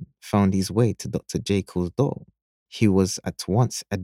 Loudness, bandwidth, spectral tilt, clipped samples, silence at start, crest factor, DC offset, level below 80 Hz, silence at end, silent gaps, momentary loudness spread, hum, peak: -24 LUFS; 15.5 kHz; -6 dB/octave; under 0.1%; 0 s; 18 dB; under 0.1%; -52 dBFS; 0 s; 2.42-2.66 s; 8 LU; none; -6 dBFS